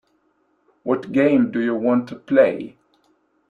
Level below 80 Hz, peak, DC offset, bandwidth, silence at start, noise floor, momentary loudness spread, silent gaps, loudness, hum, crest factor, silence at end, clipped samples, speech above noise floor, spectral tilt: -66 dBFS; -2 dBFS; under 0.1%; 6.4 kHz; 0.85 s; -65 dBFS; 14 LU; none; -19 LUFS; none; 18 dB; 0.8 s; under 0.1%; 46 dB; -8.5 dB/octave